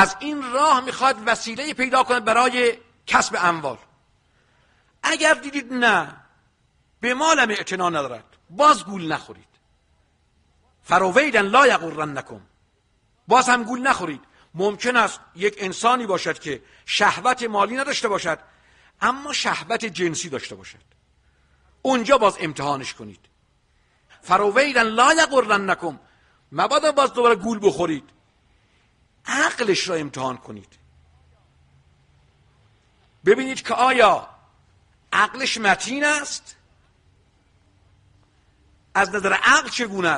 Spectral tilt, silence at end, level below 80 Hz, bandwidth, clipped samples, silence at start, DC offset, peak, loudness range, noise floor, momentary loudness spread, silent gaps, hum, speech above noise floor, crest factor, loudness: -3 dB/octave; 0 s; -60 dBFS; 11.5 kHz; under 0.1%; 0 s; under 0.1%; -2 dBFS; 7 LU; -64 dBFS; 13 LU; none; none; 44 dB; 20 dB; -20 LUFS